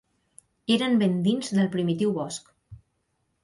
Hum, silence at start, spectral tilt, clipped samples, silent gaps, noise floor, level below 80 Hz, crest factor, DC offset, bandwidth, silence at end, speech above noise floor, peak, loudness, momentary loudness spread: none; 0.7 s; -6 dB/octave; under 0.1%; none; -74 dBFS; -64 dBFS; 16 dB; under 0.1%; 11.5 kHz; 0.7 s; 50 dB; -10 dBFS; -25 LUFS; 12 LU